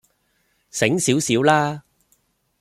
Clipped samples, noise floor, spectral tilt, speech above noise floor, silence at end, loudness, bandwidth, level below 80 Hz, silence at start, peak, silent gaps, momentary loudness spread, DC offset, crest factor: under 0.1%; -66 dBFS; -4 dB/octave; 48 dB; 0.8 s; -19 LUFS; 15.5 kHz; -60 dBFS; 0.75 s; -2 dBFS; none; 13 LU; under 0.1%; 20 dB